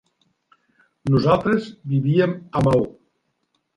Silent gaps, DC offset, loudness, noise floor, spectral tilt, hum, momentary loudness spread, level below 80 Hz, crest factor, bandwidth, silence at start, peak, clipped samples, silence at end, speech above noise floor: none; under 0.1%; -20 LUFS; -71 dBFS; -8.5 dB/octave; none; 7 LU; -50 dBFS; 18 dB; 10.5 kHz; 1.05 s; -4 dBFS; under 0.1%; 0.85 s; 53 dB